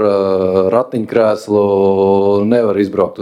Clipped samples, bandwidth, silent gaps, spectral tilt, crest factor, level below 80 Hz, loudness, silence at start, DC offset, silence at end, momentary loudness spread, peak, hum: under 0.1%; 10.5 kHz; none; -8 dB/octave; 12 dB; -56 dBFS; -13 LUFS; 0 s; under 0.1%; 0 s; 3 LU; 0 dBFS; none